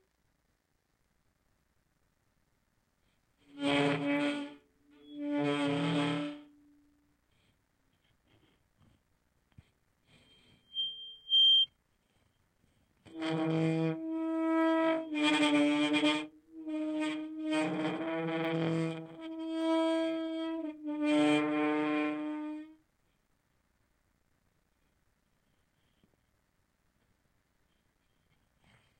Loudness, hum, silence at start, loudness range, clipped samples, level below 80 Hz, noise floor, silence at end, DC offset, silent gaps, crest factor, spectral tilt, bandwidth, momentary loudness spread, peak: -31 LUFS; none; 3.55 s; 9 LU; under 0.1%; -78 dBFS; -77 dBFS; 6.25 s; under 0.1%; none; 18 dB; -5 dB/octave; 9.6 kHz; 14 LU; -16 dBFS